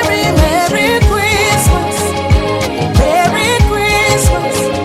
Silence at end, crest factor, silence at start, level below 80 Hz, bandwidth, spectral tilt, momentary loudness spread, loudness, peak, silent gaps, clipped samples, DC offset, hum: 0 s; 12 dB; 0 s; -20 dBFS; 16 kHz; -4.5 dB/octave; 4 LU; -11 LUFS; 0 dBFS; none; under 0.1%; under 0.1%; none